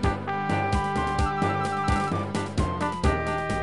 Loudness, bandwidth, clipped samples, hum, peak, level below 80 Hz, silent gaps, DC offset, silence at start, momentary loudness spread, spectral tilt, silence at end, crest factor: -26 LUFS; 11.5 kHz; under 0.1%; none; -10 dBFS; -34 dBFS; none; 0.4%; 0 s; 3 LU; -6 dB/octave; 0 s; 14 dB